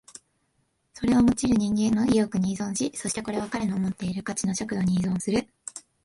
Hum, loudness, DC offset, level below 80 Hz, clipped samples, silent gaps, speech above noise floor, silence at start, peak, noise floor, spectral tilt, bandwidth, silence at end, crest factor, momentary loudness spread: none; -25 LUFS; under 0.1%; -52 dBFS; under 0.1%; none; 47 dB; 0.95 s; -12 dBFS; -72 dBFS; -5.5 dB/octave; 11.5 kHz; 0.25 s; 14 dB; 9 LU